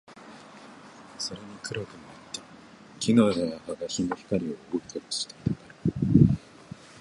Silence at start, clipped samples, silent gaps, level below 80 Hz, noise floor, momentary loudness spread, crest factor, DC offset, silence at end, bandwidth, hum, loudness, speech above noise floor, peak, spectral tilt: 0.1 s; under 0.1%; none; -48 dBFS; -50 dBFS; 25 LU; 24 dB; under 0.1%; 0.65 s; 11.5 kHz; none; -28 LUFS; 22 dB; -6 dBFS; -6 dB/octave